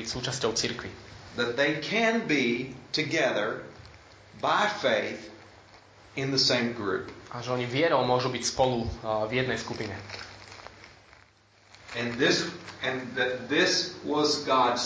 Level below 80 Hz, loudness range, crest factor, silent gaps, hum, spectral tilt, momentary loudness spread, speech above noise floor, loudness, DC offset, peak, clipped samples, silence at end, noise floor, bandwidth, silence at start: -56 dBFS; 5 LU; 18 dB; none; none; -3.5 dB/octave; 16 LU; 32 dB; -27 LUFS; under 0.1%; -10 dBFS; under 0.1%; 0 s; -59 dBFS; 8 kHz; 0 s